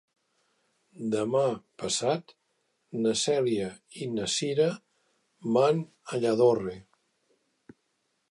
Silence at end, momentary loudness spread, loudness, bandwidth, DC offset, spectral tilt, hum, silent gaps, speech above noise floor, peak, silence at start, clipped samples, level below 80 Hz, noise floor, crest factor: 1.5 s; 14 LU; -28 LUFS; 11.5 kHz; under 0.1%; -4.5 dB/octave; none; none; 49 dB; -12 dBFS; 1 s; under 0.1%; -68 dBFS; -76 dBFS; 18 dB